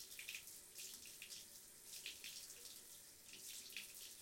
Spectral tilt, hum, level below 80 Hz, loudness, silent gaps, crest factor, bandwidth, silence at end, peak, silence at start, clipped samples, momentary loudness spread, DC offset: 1 dB/octave; none; -84 dBFS; -53 LUFS; none; 22 dB; 17 kHz; 0 s; -34 dBFS; 0 s; under 0.1%; 7 LU; under 0.1%